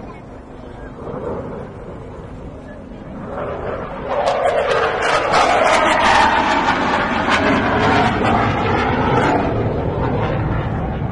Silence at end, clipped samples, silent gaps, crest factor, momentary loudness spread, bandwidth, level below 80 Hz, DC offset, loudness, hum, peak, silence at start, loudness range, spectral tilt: 0 s; under 0.1%; none; 16 dB; 20 LU; 11.5 kHz; -34 dBFS; under 0.1%; -17 LUFS; none; -2 dBFS; 0 s; 14 LU; -5.5 dB/octave